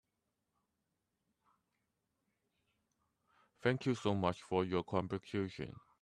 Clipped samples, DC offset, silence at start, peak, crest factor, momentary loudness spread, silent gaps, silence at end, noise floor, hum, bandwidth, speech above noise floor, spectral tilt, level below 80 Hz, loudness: under 0.1%; under 0.1%; 3.65 s; -18 dBFS; 22 dB; 7 LU; none; 0.25 s; -86 dBFS; none; 11 kHz; 49 dB; -6.5 dB/octave; -72 dBFS; -38 LUFS